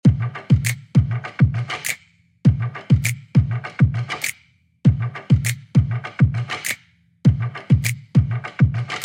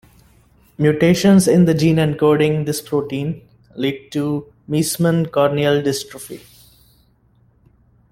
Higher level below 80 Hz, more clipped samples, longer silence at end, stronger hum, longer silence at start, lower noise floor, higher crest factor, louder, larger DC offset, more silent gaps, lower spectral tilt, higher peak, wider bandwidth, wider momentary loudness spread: first, -38 dBFS vs -50 dBFS; neither; second, 0 s vs 1.75 s; neither; second, 0.05 s vs 0.8 s; about the same, -56 dBFS vs -56 dBFS; about the same, 16 dB vs 16 dB; second, -20 LUFS vs -17 LUFS; neither; neither; about the same, -6 dB/octave vs -6 dB/octave; about the same, -2 dBFS vs -2 dBFS; about the same, 16.5 kHz vs 16 kHz; second, 7 LU vs 15 LU